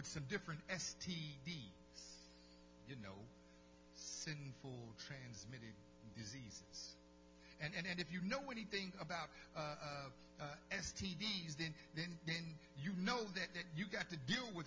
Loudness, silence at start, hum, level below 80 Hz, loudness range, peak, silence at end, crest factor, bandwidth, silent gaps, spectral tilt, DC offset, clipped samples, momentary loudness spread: -47 LUFS; 0 s; 60 Hz at -70 dBFS; -70 dBFS; 9 LU; -28 dBFS; 0 s; 22 dB; 7.6 kHz; none; -4 dB/octave; under 0.1%; under 0.1%; 17 LU